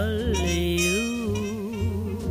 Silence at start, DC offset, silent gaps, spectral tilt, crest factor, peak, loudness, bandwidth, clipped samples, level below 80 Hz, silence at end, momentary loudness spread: 0 s; under 0.1%; none; -4.5 dB/octave; 14 dB; -10 dBFS; -25 LUFS; 15.5 kHz; under 0.1%; -34 dBFS; 0 s; 6 LU